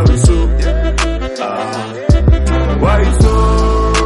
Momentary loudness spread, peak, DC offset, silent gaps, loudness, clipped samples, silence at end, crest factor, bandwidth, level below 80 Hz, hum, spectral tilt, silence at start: 8 LU; 0 dBFS; under 0.1%; none; -13 LUFS; under 0.1%; 0 s; 10 dB; 11.5 kHz; -14 dBFS; none; -6 dB/octave; 0 s